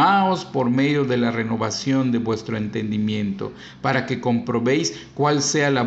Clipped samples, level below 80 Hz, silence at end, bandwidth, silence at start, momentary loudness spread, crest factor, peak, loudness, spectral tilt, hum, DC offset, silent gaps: under 0.1%; -58 dBFS; 0 s; 8.4 kHz; 0 s; 7 LU; 16 dB; -6 dBFS; -22 LUFS; -5 dB/octave; none; under 0.1%; none